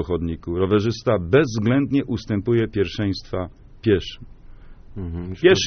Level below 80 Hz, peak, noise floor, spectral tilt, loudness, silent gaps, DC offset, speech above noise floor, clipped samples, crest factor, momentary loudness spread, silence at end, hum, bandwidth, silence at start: -42 dBFS; -2 dBFS; -41 dBFS; -5.5 dB/octave; -22 LUFS; none; under 0.1%; 21 dB; under 0.1%; 18 dB; 14 LU; 0 s; none; 6.6 kHz; 0 s